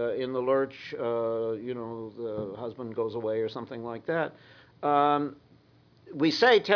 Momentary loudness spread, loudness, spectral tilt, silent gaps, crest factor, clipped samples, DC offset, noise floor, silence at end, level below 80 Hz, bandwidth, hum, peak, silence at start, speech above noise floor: 13 LU; -29 LUFS; -5.5 dB/octave; none; 22 dB; under 0.1%; under 0.1%; -60 dBFS; 0 s; -70 dBFS; 5.4 kHz; none; -8 dBFS; 0 s; 32 dB